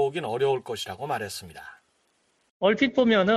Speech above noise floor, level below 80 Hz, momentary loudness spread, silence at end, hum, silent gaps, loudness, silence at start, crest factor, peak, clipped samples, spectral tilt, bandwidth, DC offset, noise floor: 44 dB; -64 dBFS; 21 LU; 0 s; none; 2.51-2.60 s; -25 LUFS; 0 s; 18 dB; -8 dBFS; under 0.1%; -5 dB/octave; 13.5 kHz; under 0.1%; -69 dBFS